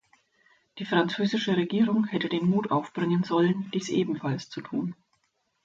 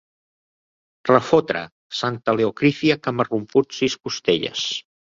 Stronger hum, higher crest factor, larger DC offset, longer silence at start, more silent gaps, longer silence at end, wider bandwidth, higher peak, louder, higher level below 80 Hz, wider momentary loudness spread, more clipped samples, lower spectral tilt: neither; about the same, 18 dB vs 20 dB; neither; second, 0.75 s vs 1.05 s; second, none vs 1.72-1.90 s; first, 0.7 s vs 0.2 s; about the same, 7.8 kHz vs 7.6 kHz; second, -10 dBFS vs -2 dBFS; second, -27 LUFS vs -21 LUFS; second, -70 dBFS vs -60 dBFS; about the same, 8 LU vs 8 LU; neither; first, -6.5 dB/octave vs -5 dB/octave